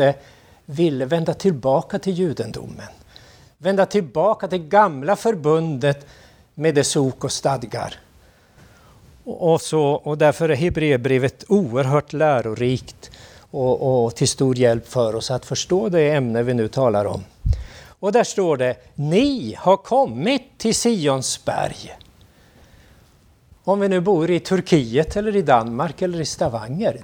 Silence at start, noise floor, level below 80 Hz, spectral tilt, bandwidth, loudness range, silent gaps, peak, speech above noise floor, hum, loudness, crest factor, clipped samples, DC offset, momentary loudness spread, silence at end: 0 s; -53 dBFS; -40 dBFS; -5.5 dB/octave; 17.5 kHz; 4 LU; none; 0 dBFS; 34 dB; none; -20 LUFS; 20 dB; under 0.1%; under 0.1%; 10 LU; 0 s